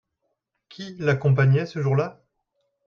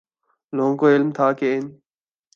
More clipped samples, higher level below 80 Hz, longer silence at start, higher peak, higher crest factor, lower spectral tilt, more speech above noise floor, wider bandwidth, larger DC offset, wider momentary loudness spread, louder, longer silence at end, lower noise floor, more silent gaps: neither; first, -60 dBFS vs -74 dBFS; first, 0.8 s vs 0.55 s; second, -8 dBFS vs -4 dBFS; about the same, 16 dB vs 16 dB; about the same, -8 dB/octave vs -8 dB/octave; first, 56 dB vs 48 dB; about the same, 6.8 kHz vs 7 kHz; neither; first, 16 LU vs 12 LU; about the same, -22 LUFS vs -20 LUFS; about the same, 0.75 s vs 0.65 s; first, -77 dBFS vs -67 dBFS; neither